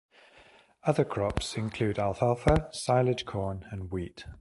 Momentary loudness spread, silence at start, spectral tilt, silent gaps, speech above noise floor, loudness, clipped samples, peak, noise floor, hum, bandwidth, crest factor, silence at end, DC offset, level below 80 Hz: 11 LU; 0.85 s; -6 dB/octave; none; 29 dB; -30 LUFS; under 0.1%; -6 dBFS; -58 dBFS; none; 11.5 kHz; 24 dB; 0.05 s; under 0.1%; -42 dBFS